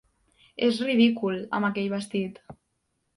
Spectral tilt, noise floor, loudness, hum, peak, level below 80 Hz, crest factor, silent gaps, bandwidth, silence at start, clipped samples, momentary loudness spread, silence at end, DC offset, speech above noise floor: -6 dB/octave; -76 dBFS; -26 LUFS; none; -10 dBFS; -68 dBFS; 18 dB; none; 11.5 kHz; 0.6 s; under 0.1%; 10 LU; 0.65 s; under 0.1%; 50 dB